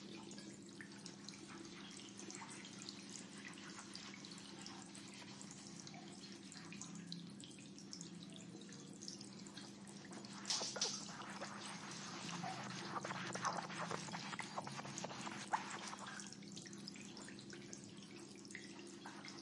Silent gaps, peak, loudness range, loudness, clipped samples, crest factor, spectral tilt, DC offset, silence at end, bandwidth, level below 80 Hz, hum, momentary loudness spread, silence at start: none; -26 dBFS; 8 LU; -49 LUFS; under 0.1%; 26 dB; -2.5 dB/octave; under 0.1%; 0 s; 11.5 kHz; -86 dBFS; none; 11 LU; 0 s